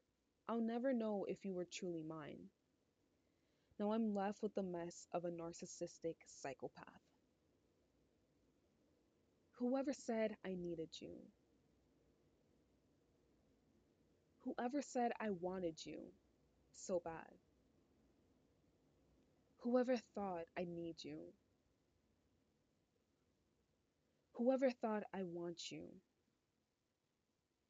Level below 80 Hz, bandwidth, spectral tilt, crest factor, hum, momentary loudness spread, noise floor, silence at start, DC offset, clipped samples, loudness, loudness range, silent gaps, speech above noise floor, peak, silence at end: -82 dBFS; 8.8 kHz; -5.5 dB/octave; 22 dB; none; 16 LU; -88 dBFS; 0.45 s; under 0.1%; under 0.1%; -45 LUFS; 10 LU; none; 43 dB; -26 dBFS; 1.7 s